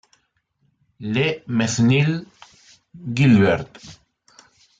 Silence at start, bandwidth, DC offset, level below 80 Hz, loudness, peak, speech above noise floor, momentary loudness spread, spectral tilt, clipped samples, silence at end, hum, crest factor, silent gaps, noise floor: 1 s; 9.2 kHz; under 0.1%; -56 dBFS; -19 LUFS; -4 dBFS; 49 dB; 17 LU; -6 dB/octave; under 0.1%; 0.9 s; none; 18 dB; none; -68 dBFS